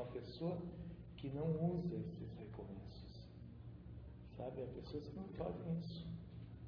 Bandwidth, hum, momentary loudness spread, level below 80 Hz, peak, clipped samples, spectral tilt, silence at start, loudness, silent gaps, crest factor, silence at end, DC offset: 5.4 kHz; none; 15 LU; -60 dBFS; -28 dBFS; under 0.1%; -8.5 dB/octave; 0 s; -47 LUFS; none; 18 dB; 0 s; under 0.1%